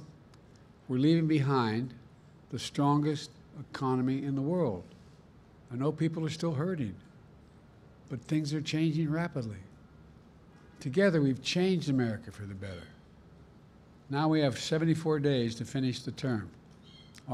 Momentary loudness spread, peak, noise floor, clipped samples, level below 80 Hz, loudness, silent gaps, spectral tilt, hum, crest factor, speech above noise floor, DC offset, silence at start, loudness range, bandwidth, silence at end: 16 LU; -14 dBFS; -57 dBFS; under 0.1%; -64 dBFS; -31 LUFS; none; -6.5 dB/octave; none; 18 dB; 26 dB; under 0.1%; 0 s; 4 LU; 12 kHz; 0 s